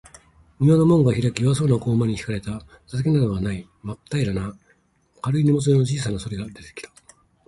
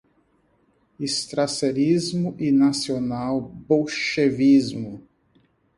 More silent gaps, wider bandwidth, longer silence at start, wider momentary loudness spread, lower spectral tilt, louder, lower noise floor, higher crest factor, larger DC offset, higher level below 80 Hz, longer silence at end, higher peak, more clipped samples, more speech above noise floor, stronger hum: neither; about the same, 11.5 kHz vs 11.5 kHz; second, 0.6 s vs 1 s; first, 19 LU vs 12 LU; first, -7.5 dB/octave vs -5 dB/octave; about the same, -21 LUFS vs -22 LUFS; about the same, -62 dBFS vs -64 dBFS; about the same, 16 dB vs 16 dB; neither; first, -46 dBFS vs -58 dBFS; second, 0.6 s vs 0.8 s; about the same, -6 dBFS vs -6 dBFS; neither; about the same, 41 dB vs 42 dB; neither